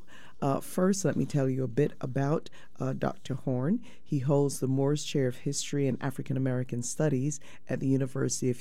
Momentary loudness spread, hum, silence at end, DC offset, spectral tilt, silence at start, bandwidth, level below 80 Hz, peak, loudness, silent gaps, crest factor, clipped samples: 7 LU; none; 0 s; 1%; -6 dB/octave; 0.1 s; 15 kHz; -62 dBFS; -14 dBFS; -30 LUFS; none; 16 dB; under 0.1%